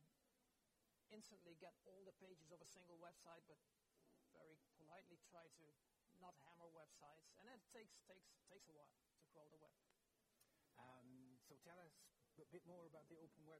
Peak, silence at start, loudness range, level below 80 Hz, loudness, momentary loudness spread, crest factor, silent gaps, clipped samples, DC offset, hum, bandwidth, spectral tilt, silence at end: -50 dBFS; 0 s; 2 LU; under -90 dBFS; -67 LUFS; 4 LU; 18 dB; none; under 0.1%; under 0.1%; none; 15 kHz; -4 dB/octave; 0 s